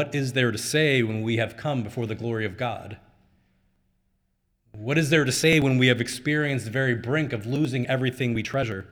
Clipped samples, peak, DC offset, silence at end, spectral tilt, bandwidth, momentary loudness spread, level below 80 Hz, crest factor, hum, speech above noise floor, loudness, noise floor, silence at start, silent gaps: under 0.1%; -6 dBFS; under 0.1%; 0.05 s; -5 dB/octave; over 20 kHz; 9 LU; -56 dBFS; 20 dB; none; 48 dB; -24 LUFS; -72 dBFS; 0 s; none